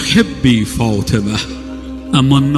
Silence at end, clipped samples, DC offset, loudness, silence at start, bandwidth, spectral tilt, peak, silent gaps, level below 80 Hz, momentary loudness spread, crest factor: 0 s; under 0.1%; under 0.1%; -14 LUFS; 0 s; 14.5 kHz; -5.5 dB/octave; 0 dBFS; none; -32 dBFS; 15 LU; 14 dB